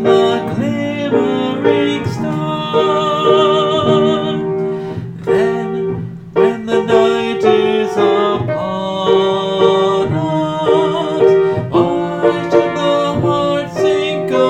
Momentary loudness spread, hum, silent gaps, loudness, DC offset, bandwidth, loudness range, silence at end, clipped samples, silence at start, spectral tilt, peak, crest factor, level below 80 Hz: 7 LU; none; none; -15 LUFS; under 0.1%; 8.8 kHz; 2 LU; 0 s; under 0.1%; 0 s; -6.5 dB/octave; 0 dBFS; 14 dB; -48 dBFS